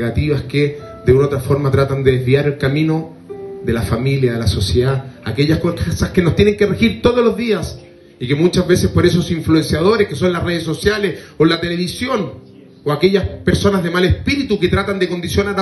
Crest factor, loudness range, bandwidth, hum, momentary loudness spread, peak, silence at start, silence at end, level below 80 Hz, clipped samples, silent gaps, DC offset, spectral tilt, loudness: 14 dB; 2 LU; 12.5 kHz; none; 7 LU; 0 dBFS; 0 s; 0 s; -36 dBFS; under 0.1%; none; under 0.1%; -6.5 dB/octave; -16 LUFS